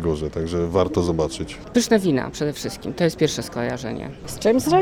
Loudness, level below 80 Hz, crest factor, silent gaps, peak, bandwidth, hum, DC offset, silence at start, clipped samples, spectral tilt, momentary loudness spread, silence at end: -22 LUFS; -42 dBFS; 18 dB; none; -2 dBFS; 20 kHz; none; under 0.1%; 0 s; under 0.1%; -5.5 dB/octave; 11 LU; 0 s